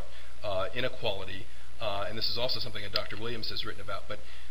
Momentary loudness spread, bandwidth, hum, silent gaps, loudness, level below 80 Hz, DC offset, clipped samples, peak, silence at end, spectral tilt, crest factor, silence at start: 12 LU; 16 kHz; none; none; -34 LUFS; -52 dBFS; 6%; under 0.1%; -10 dBFS; 0 s; -4.5 dB/octave; 26 dB; 0 s